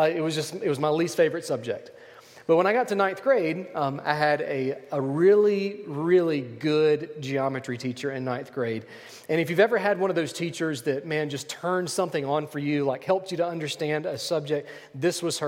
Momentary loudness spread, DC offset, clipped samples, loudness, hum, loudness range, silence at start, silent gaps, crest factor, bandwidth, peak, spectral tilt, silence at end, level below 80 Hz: 9 LU; under 0.1%; under 0.1%; -26 LUFS; none; 4 LU; 0 s; none; 18 dB; 16.5 kHz; -8 dBFS; -5 dB/octave; 0 s; -74 dBFS